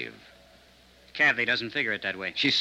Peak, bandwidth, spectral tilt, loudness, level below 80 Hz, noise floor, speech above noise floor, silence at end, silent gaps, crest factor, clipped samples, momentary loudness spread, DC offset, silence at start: -12 dBFS; 14.5 kHz; -3 dB/octave; -25 LUFS; -66 dBFS; -57 dBFS; 29 dB; 0 s; none; 18 dB; under 0.1%; 13 LU; under 0.1%; 0 s